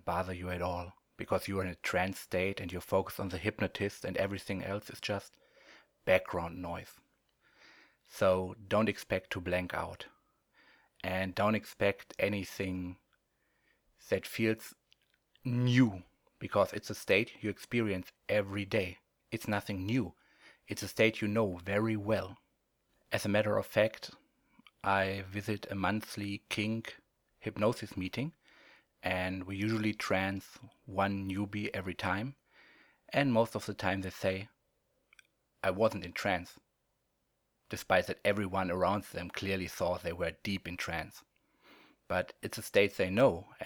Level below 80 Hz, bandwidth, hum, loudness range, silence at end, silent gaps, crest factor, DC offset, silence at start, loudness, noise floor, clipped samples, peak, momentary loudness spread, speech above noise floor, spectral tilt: -64 dBFS; over 20 kHz; none; 4 LU; 0 s; none; 24 dB; under 0.1%; 0.05 s; -34 LUFS; -80 dBFS; under 0.1%; -12 dBFS; 12 LU; 46 dB; -5.5 dB/octave